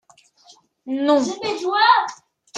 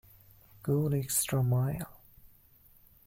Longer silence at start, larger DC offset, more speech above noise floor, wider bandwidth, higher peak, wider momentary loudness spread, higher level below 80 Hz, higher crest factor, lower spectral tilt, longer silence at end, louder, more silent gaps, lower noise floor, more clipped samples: first, 0.85 s vs 0.65 s; neither; first, 35 dB vs 31 dB; second, 9.6 kHz vs 16.5 kHz; first, -2 dBFS vs -16 dBFS; about the same, 12 LU vs 12 LU; second, -74 dBFS vs -58 dBFS; about the same, 20 dB vs 18 dB; second, -2.5 dB/octave vs -5.5 dB/octave; second, 0 s vs 1.15 s; first, -19 LUFS vs -31 LUFS; neither; second, -53 dBFS vs -61 dBFS; neither